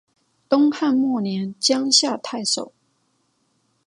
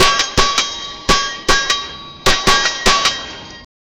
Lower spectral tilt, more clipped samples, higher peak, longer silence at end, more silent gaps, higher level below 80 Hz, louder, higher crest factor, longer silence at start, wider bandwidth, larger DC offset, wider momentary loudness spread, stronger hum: first, -3 dB/octave vs -1.5 dB/octave; neither; about the same, -2 dBFS vs 0 dBFS; first, 1.2 s vs 0.35 s; neither; second, -72 dBFS vs -28 dBFS; second, -20 LUFS vs -14 LUFS; about the same, 20 dB vs 16 dB; first, 0.5 s vs 0 s; second, 11.5 kHz vs 18.5 kHz; neither; second, 9 LU vs 15 LU; neither